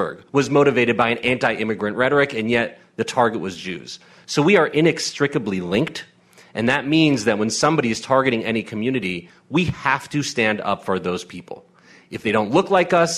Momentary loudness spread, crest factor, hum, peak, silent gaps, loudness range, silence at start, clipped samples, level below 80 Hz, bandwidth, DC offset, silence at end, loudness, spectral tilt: 14 LU; 16 dB; none; -4 dBFS; none; 3 LU; 0 s; under 0.1%; -54 dBFS; 13.5 kHz; under 0.1%; 0 s; -20 LUFS; -5 dB/octave